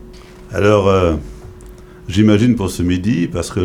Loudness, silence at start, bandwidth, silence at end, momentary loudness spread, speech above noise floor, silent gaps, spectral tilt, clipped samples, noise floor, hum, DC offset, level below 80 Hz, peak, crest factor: -15 LUFS; 0 s; 15 kHz; 0 s; 13 LU; 23 dB; none; -6.5 dB/octave; under 0.1%; -37 dBFS; none; under 0.1%; -34 dBFS; -2 dBFS; 14 dB